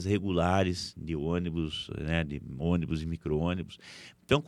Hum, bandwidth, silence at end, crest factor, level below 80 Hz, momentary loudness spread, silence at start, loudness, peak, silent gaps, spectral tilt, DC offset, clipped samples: none; 11.5 kHz; 0 s; 20 dB; -46 dBFS; 10 LU; 0 s; -31 LUFS; -10 dBFS; none; -6.5 dB/octave; under 0.1%; under 0.1%